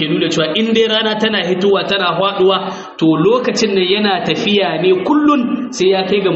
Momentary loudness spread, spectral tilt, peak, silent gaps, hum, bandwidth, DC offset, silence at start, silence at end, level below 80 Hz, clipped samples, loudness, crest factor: 3 LU; -3 dB/octave; -2 dBFS; none; none; 8 kHz; under 0.1%; 0 s; 0 s; -56 dBFS; under 0.1%; -14 LUFS; 12 dB